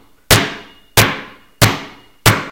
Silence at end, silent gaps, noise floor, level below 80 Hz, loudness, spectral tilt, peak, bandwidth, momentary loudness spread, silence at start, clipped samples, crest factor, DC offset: 0 s; none; -33 dBFS; -34 dBFS; -14 LUFS; -3 dB/octave; 0 dBFS; over 20 kHz; 14 LU; 0.3 s; 0.2%; 16 dB; under 0.1%